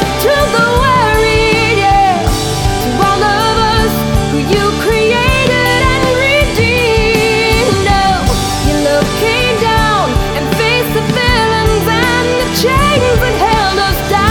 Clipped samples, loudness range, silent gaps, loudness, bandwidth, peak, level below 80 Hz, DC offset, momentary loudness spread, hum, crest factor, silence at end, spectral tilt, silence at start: under 0.1%; 1 LU; none; -11 LUFS; 19.5 kHz; 0 dBFS; -22 dBFS; under 0.1%; 4 LU; none; 10 dB; 0 s; -4.5 dB/octave; 0 s